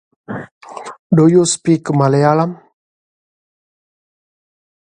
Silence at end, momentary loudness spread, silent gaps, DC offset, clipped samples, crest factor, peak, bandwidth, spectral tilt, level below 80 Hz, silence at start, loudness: 2.4 s; 21 LU; 0.52-0.61 s, 0.99-1.10 s; under 0.1%; under 0.1%; 16 dB; 0 dBFS; 10.5 kHz; -6 dB/octave; -58 dBFS; 0.3 s; -13 LUFS